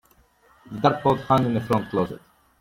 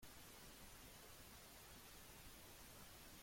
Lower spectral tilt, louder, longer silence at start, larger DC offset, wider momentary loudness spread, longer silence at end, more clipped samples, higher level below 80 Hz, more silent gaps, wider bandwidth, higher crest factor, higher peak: first, -7.5 dB/octave vs -2.5 dB/octave; first, -23 LUFS vs -60 LUFS; first, 0.7 s vs 0 s; neither; first, 13 LU vs 0 LU; first, 0.45 s vs 0 s; neither; first, -54 dBFS vs -70 dBFS; neither; about the same, 16.5 kHz vs 16.5 kHz; first, 22 dB vs 14 dB; first, -4 dBFS vs -48 dBFS